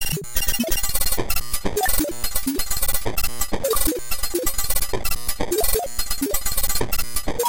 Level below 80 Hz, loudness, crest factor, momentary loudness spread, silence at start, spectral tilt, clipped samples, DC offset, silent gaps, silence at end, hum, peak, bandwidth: -30 dBFS; -23 LUFS; 18 dB; 4 LU; 0 s; -2.5 dB/octave; under 0.1%; 7%; none; 0 s; none; -4 dBFS; 17.5 kHz